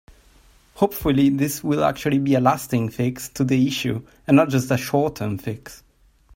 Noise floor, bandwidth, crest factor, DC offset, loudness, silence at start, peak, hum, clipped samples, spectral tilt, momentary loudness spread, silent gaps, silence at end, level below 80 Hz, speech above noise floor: -53 dBFS; 16.5 kHz; 20 dB; under 0.1%; -21 LUFS; 0.75 s; -2 dBFS; none; under 0.1%; -6 dB/octave; 10 LU; none; 0.6 s; -48 dBFS; 33 dB